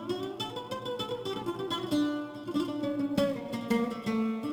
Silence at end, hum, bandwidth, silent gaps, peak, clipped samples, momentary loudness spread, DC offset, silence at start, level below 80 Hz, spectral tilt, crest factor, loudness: 0 s; none; over 20 kHz; none; -14 dBFS; under 0.1%; 6 LU; under 0.1%; 0 s; -64 dBFS; -5.5 dB/octave; 18 dB; -32 LUFS